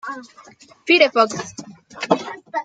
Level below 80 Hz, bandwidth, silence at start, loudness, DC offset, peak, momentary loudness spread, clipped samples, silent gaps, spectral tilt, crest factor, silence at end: -68 dBFS; 9.4 kHz; 0.05 s; -18 LUFS; under 0.1%; -2 dBFS; 21 LU; under 0.1%; none; -3.5 dB/octave; 20 dB; 0 s